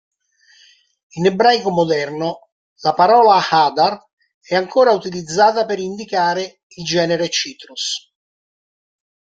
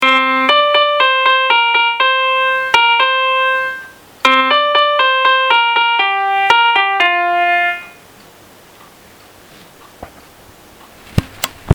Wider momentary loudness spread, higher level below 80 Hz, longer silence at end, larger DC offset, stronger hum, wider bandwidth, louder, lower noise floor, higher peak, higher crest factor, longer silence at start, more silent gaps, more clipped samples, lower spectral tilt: first, 13 LU vs 9 LU; second, -62 dBFS vs -44 dBFS; first, 1.4 s vs 0 s; neither; neither; second, 9.2 kHz vs over 20 kHz; second, -16 LUFS vs -12 LUFS; first, -54 dBFS vs -42 dBFS; about the same, -2 dBFS vs 0 dBFS; about the same, 16 dB vs 14 dB; first, 1.15 s vs 0 s; first, 2.52-2.76 s, 4.13-4.17 s, 4.34-4.41 s, 6.63-6.70 s vs none; neither; about the same, -4 dB/octave vs -3.5 dB/octave